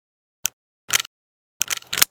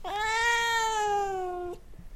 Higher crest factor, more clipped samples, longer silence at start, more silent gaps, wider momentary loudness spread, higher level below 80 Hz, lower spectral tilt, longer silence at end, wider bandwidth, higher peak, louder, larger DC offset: first, 26 dB vs 12 dB; neither; first, 0.45 s vs 0 s; first, 0.53-0.88 s, 1.07-1.60 s vs none; second, 7 LU vs 14 LU; second, -60 dBFS vs -50 dBFS; second, 1.5 dB/octave vs -1.5 dB/octave; about the same, 0.05 s vs 0 s; first, over 20 kHz vs 16.5 kHz; first, 0 dBFS vs -16 dBFS; first, -23 LUFS vs -27 LUFS; neither